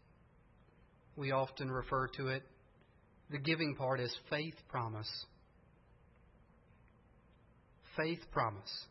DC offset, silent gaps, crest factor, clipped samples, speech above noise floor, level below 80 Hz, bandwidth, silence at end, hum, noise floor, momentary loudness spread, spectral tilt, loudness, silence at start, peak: under 0.1%; none; 22 dB; under 0.1%; 28 dB; -64 dBFS; 5.8 kHz; 0.05 s; none; -67 dBFS; 10 LU; -4 dB/octave; -39 LUFS; 1.15 s; -20 dBFS